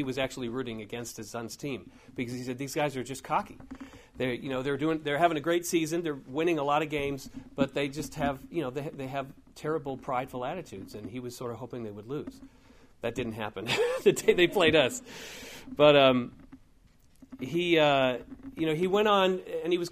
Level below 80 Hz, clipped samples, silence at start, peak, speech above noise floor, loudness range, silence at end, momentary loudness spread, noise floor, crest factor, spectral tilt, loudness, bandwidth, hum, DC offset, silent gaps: -58 dBFS; under 0.1%; 0 s; -8 dBFS; 31 dB; 11 LU; 0 s; 18 LU; -60 dBFS; 22 dB; -4.5 dB/octave; -29 LUFS; 15.5 kHz; none; under 0.1%; none